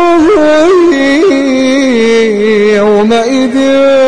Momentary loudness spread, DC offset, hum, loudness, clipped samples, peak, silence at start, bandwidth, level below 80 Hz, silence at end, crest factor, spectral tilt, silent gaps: 3 LU; 3%; none; -7 LUFS; under 0.1%; 0 dBFS; 0 s; 10.5 kHz; -42 dBFS; 0 s; 6 dB; -4.5 dB/octave; none